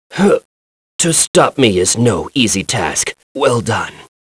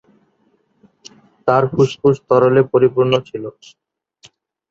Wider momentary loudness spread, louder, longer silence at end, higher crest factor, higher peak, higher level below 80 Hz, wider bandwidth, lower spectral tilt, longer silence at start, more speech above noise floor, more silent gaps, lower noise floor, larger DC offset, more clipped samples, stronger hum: second, 9 LU vs 15 LU; about the same, -14 LUFS vs -15 LUFS; second, 0.3 s vs 1.2 s; about the same, 14 dB vs 18 dB; about the same, 0 dBFS vs 0 dBFS; first, -46 dBFS vs -56 dBFS; first, 11 kHz vs 7.6 kHz; second, -3.5 dB/octave vs -7 dB/octave; second, 0.1 s vs 1.45 s; first, over 76 dB vs 46 dB; first, 0.45-0.99 s, 1.27-1.34 s, 3.23-3.35 s vs none; first, under -90 dBFS vs -61 dBFS; neither; neither; neither